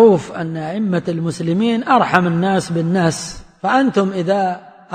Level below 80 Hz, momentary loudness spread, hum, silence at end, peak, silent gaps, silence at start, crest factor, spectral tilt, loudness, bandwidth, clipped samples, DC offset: -50 dBFS; 10 LU; none; 0 s; 0 dBFS; none; 0 s; 16 dB; -6 dB/octave; -17 LUFS; 9.6 kHz; under 0.1%; under 0.1%